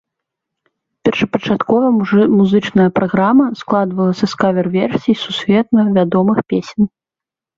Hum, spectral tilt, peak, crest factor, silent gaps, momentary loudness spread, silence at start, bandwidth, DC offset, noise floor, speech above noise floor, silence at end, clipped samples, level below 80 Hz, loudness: none; -7.5 dB/octave; 0 dBFS; 14 dB; none; 5 LU; 1.05 s; 7.4 kHz; under 0.1%; -87 dBFS; 74 dB; 0.7 s; under 0.1%; -52 dBFS; -14 LUFS